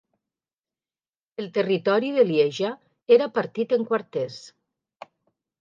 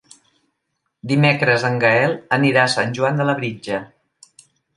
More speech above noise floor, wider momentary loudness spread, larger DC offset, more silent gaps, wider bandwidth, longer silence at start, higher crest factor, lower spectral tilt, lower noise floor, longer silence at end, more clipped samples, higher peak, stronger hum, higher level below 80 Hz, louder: first, over 68 dB vs 57 dB; first, 15 LU vs 12 LU; neither; neither; second, 7.4 kHz vs 11.5 kHz; first, 1.4 s vs 1.05 s; about the same, 20 dB vs 18 dB; about the same, -6 dB/octave vs -5.5 dB/octave; first, under -90 dBFS vs -74 dBFS; first, 1.1 s vs 0.9 s; neither; second, -6 dBFS vs 0 dBFS; neither; second, -80 dBFS vs -62 dBFS; second, -23 LUFS vs -18 LUFS